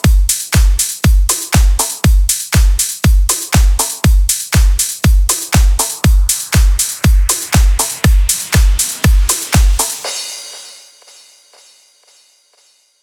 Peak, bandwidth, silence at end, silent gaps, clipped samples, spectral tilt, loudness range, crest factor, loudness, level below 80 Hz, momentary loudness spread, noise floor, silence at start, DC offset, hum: 0 dBFS; 19 kHz; 2.3 s; none; under 0.1%; -3.5 dB/octave; 4 LU; 12 dB; -13 LUFS; -14 dBFS; 2 LU; -53 dBFS; 0.05 s; under 0.1%; none